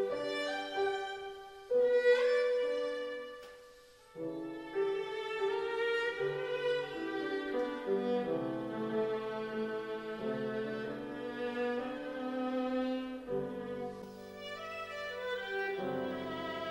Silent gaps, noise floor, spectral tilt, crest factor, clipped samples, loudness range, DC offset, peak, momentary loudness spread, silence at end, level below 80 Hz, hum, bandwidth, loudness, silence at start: none; -58 dBFS; -5.5 dB/octave; 18 dB; under 0.1%; 6 LU; under 0.1%; -18 dBFS; 11 LU; 0 s; -70 dBFS; none; 16 kHz; -36 LUFS; 0 s